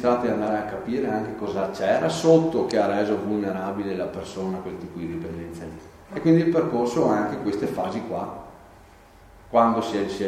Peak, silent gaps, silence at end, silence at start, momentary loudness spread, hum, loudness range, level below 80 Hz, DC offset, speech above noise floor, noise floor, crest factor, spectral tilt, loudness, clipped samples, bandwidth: -4 dBFS; none; 0 s; 0 s; 15 LU; none; 4 LU; -54 dBFS; under 0.1%; 26 dB; -50 dBFS; 20 dB; -6.5 dB/octave; -24 LUFS; under 0.1%; 13.5 kHz